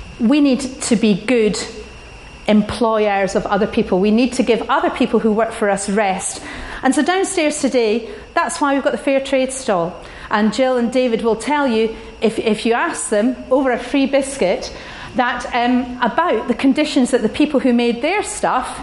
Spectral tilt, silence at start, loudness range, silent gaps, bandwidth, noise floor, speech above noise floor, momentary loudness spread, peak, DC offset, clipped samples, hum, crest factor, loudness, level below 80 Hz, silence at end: -4.5 dB/octave; 0 s; 2 LU; none; 11.5 kHz; -37 dBFS; 20 dB; 7 LU; -2 dBFS; under 0.1%; under 0.1%; none; 16 dB; -17 LUFS; -44 dBFS; 0 s